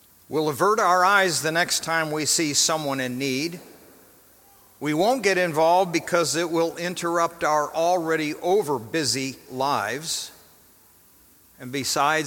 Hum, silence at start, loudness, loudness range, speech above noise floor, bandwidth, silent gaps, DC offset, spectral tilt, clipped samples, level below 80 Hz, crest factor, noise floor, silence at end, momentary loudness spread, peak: none; 0.3 s; -23 LUFS; 6 LU; 32 dB; 17.5 kHz; none; under 0.1%; -3 dB/octave; under 0.1%; -66 dBFS; 20 dB; -55 dBFS; 0 s; 9 LU; -4 dBFS